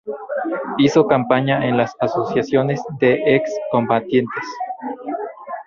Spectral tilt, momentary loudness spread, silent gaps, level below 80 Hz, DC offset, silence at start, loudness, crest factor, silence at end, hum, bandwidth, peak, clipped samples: -6.5 dB/octave; 12 LU; none; -56 dBFS; under 0.1%; 0.05 s; -19 LUFS; 16 dB; 0.05 s; none; 7.4 kHz; -2 dBFS; under 0.1%